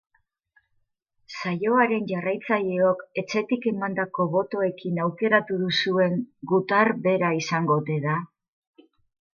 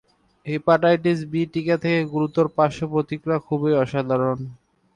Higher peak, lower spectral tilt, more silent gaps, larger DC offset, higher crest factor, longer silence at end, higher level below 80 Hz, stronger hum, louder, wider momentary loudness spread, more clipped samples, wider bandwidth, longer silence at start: about the same, -6 dBFS vs -4 dBFS; second, -6 dB/octave vs -8 dB/octave; neither; neither; about the same, 20 dB vs 16 dB; first, 1.1 s vs 0.4 s; second, -72 dBFS vs -58 dBFS; neither; about the same, -24 LUFS vs -22 LUFS; about the same, 7 LU vs 7 LU; neither; second, 7.2 kHz vs 10 kHz; first, 1.3 s vs 0.45 s